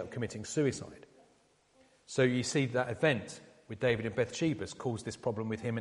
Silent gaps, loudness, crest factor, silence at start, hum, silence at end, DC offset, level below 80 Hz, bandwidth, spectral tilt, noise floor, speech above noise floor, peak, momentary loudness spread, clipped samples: none; -33 LUFS; 20 dB; 0 s; none; 0 s; under 0.1%; -66 dBFS; 11.5 kHz; -5.5 dB/octave; -68 dBFS; 35 dB; -14 dBFS; 12 LU; under 0.1%